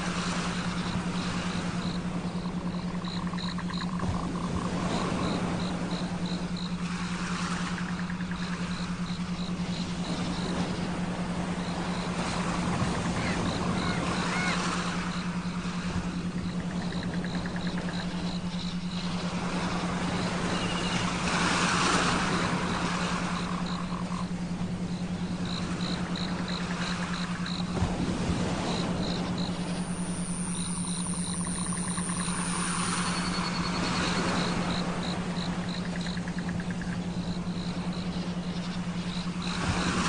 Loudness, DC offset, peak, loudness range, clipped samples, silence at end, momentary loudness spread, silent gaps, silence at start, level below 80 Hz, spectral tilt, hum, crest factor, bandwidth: -31 LUFS; 0.2%; -14 dBFS; 5 LU; under 0.1%; 0 s; 5 LU; none; 0 s; -46 dBFS; -4.5 dB/octave; none; 18 dB; 10 kHz